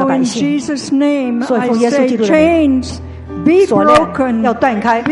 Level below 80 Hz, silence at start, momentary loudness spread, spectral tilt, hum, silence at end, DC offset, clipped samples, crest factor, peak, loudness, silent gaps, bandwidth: -40 dBFS; 0 s; 8 LU; -5.5 dB/octave; none; 0 s; under 0.1%; under 0.1%; 12 dB; 0 dBFS; -12 LUFS; none; 11.5 kHz